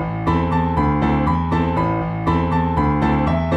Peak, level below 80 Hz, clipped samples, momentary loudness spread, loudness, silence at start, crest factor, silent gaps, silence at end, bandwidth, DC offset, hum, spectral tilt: -6 dBFS; -30 dBFS; under 0.1%; 2 LU; -19 LUFS; 0 s; 12 dB; none; 0 s; 7.6 kHz; under 0.1%; none; -9 dB/octave